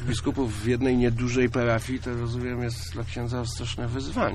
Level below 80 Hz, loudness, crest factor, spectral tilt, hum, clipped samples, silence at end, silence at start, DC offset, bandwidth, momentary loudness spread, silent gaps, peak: -38 dBFS; -27 LUFS; 14 dB; -6 dB/octave; none; under 0.1%; 0 s; 0 s; under 0.1%; 13 kHz; 8 LU; none; -12 dBFS